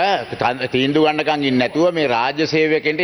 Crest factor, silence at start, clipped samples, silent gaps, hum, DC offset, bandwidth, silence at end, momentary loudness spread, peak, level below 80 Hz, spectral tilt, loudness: 14 dB; 0 s; under 0.1%; none; none; under 0.1%; 10.5 kHz; 0 s; 3 LU; -4 dBFS; -56 dBFS; -5.5 dB/octave; -17 LUFS